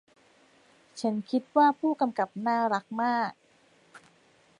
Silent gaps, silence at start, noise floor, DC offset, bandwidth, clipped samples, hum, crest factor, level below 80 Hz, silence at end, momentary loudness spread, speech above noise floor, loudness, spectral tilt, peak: none; 0.95 s; -63 dBFS; under 0.1%; 11 kHz; under 0.1%; none; 18 dB; -82 dBFS; 0.6 s; 9 LU; 36 dB; -28 LUFS; -5.5 dB/octave; -12 dBFS